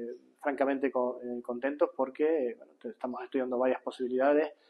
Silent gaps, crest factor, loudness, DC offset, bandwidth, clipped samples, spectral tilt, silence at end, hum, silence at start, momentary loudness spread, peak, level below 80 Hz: none; 18 dB; -31 LUFS; under 0.1%; 10.5 kHz; under 0.1%; -6 dB/octave; 0.15 s; none; 0 s; 11 LU; -14 dBFS; -86 dBFS